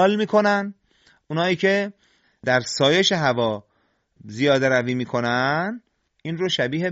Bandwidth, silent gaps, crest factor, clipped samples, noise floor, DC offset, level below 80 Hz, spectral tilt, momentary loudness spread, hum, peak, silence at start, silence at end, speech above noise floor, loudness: 8 kHz; none; 18 dB; under 0.1%; -67 dBFS; under 0.1%; -62 dBFS; -3 dB/octave; 14 LU; none; -4 dBFS; 0 s; 0 s; 46 dB; -21 LUFS